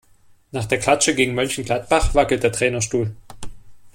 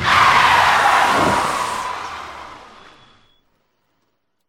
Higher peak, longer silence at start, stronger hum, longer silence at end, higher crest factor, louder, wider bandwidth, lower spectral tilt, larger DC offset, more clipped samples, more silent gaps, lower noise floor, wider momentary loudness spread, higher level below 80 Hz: about the same, -2 dBFS vs -2 dBFS; first, 0.55 s vs 0 s; neither; second, 0.05 s vs 1.85 s; about the same, 18 dB vs 16 dB; second, -19 LUFS vs -14 LUFS; about the same, 16.5 kHz vs 17.5 kHz; about the same, -3.5 dB/octave vs -2.5 dB/octave; neither; neither; neither; second, -52 dBFS vs -70 dBFS; second, 15 LU vs 21 LU; first, -32 dBFS vs -46 dBFS